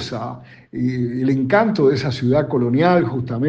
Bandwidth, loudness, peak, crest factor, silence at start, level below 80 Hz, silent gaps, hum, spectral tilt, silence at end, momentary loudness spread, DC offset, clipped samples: 7.8 kHz; -18 LUFS; -2 dBFS; 16 dB; 0 s; -52 dBFS; none; none; -8 dB/octave; 0 s; 13 LU; under 0.1%; under 0.1%